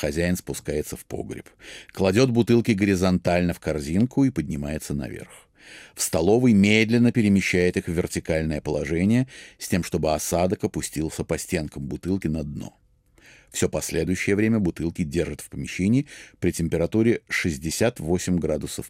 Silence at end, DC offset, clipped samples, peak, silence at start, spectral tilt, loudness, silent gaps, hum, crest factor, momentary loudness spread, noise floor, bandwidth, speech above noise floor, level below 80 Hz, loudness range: 0 s; under 0.1%; under 0.1%; -6 dBFS; 0 s; -5.5 dB/octave; -23 LUFS; none; none; 18 dB; 14 LU; -56 dBFS; 16 kHz; 33 dB; -46 dBFS; 6 LU